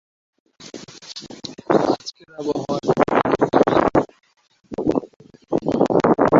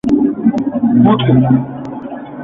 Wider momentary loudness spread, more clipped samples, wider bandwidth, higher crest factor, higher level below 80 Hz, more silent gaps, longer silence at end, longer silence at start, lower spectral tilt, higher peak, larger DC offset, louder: first, 19 LU vs 15 LU; neither; first, 7.8 kHz vs 5 kHz; first, 18 dB vs 12 dB; second, -50 dBFS vs -44 dBFS; first, 5.16-5.20 s vs none; about the same, 0 s vs 0 s; first, 0.6 s vs 0.05 s; second, -6.5 dB/octave vs -9.5 dB/octave; about the same, -2 dBFS vs 0 dBFS; neither; second, -20 LUFS vs -12 LUFS